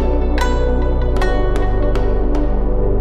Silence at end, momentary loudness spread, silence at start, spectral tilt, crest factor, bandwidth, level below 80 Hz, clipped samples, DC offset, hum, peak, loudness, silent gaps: 0 s; 2 LU; 0 s; -7.5 dB/octave; 10 dB; 8.8 kHz; -16 dBFS; under 0.1%; under 0.1%; 60 Hz at -40 dBFS; -4 dBFS; -19 LUFS; none